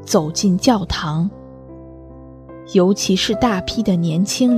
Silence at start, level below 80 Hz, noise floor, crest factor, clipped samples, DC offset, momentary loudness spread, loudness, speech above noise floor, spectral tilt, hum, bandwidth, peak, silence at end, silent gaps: 0 s; -42 dBFS; -38 dBFS; 18 dB; under 0.1%; under 0.1%; 23 LU; -18 LUFS; 22 dB; -5 dB/octave; none; 14 kHz; 0 dBFS; 0 s; none